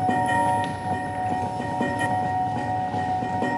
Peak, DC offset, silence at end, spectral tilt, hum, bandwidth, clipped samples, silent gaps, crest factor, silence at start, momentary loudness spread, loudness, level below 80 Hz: -10 dBFS; under 0.1%; 0 s; -6 dB/octave; none; 11.5 kHz; under 0.1%; none; 14 dB; 0 s; 5 LU; -25 LUFS; -54 dBFS